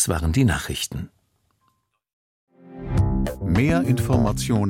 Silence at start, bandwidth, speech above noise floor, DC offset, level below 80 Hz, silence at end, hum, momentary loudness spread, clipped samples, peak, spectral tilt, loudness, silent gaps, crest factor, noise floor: 0 s; 16.5 kHz; 48 dB; under 0.1%; -34 dBFS; 0 s; none; 11 LU; under 0.1%; -6 dBFS; -5.5 dB/octave; -22 LUFS; 2.13-2.47 s; 16 dB; -69 dBFS